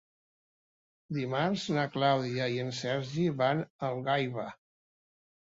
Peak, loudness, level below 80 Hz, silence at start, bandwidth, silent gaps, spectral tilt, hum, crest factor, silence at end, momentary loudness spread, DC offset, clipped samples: -14 dBFS; -31 LUFS; -70 dBFS; 1.1 s; 8 kHz; 3.70-3.79 s; -6 dB/octave; none; 18 dB; 1 s; 8 LU; under 0.1%; under 0.1%